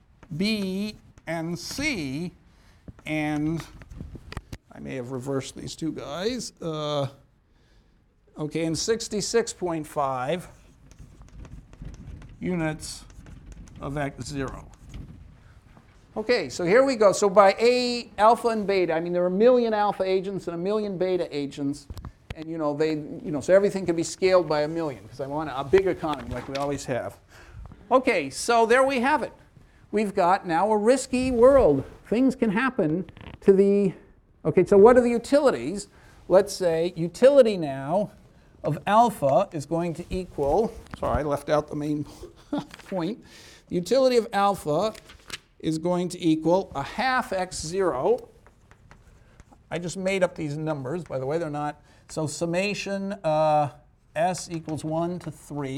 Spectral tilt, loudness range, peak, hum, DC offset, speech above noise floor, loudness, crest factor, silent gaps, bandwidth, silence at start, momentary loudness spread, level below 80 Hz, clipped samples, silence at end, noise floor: -5.5 dB/octave; 11 LU; -4 dBFS; none; under 0.1%; 37 dB; -24 LUFS; 22 dB; none; 15.5 kHz; 0.3 s; 17 LU; -50 dBFS; under 0.1%; 0 s; -60 dBFS